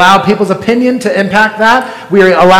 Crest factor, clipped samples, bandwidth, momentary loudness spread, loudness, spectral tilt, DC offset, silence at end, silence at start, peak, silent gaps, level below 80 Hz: 8 dB; 6%; 18 kHz; 5 LU; -9 LUFS; -5 dB/octave; under 0.1%; 0 s; 0 s; 0 dBFS; none; -44 dBFS